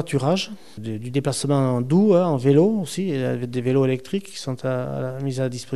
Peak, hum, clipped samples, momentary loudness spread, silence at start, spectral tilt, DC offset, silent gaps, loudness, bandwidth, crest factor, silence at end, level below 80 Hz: -4 dBFS; none; under 0.1%; 12 LU; 0 s; -6.5 dB/octave; 0.7%; none; -22 LUFS; 13 kHz; 16 dB; 0 s; -60 dBFS